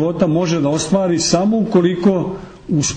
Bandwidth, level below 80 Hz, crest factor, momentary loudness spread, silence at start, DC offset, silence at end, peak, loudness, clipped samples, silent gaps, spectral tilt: 9.6 kHz; -46 dBFS; 14 dB; 6 LU; 0 s; under 0.1%; 0 s; -2 dBFS; -16 LUFS; under 0.1%; none; -5.5 dB/octave